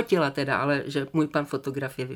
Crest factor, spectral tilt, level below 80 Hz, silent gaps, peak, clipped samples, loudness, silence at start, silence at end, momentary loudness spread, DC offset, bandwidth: 18 dB; -6.5 dB/octave; -64 dBFS; none; -10 dBFS; under 0.1%; -27 LUFS; 0 s; 0 s; 7 LU; under 0.1%; 17.5 kHz